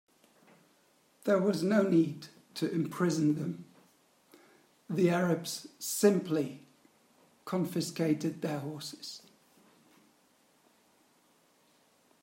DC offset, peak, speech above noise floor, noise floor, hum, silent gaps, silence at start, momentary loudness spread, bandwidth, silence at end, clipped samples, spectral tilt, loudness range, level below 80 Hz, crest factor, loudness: under 0.1%; -12 dBFS; 37 dB; -68 dBFS; none; none; 1.25 s; 17 LU; 16 kHz; 3.05 s; under 0.1%; -5.5 dB/octave; 9 LU; -80 dBFS; 22 dB; -31 LUFS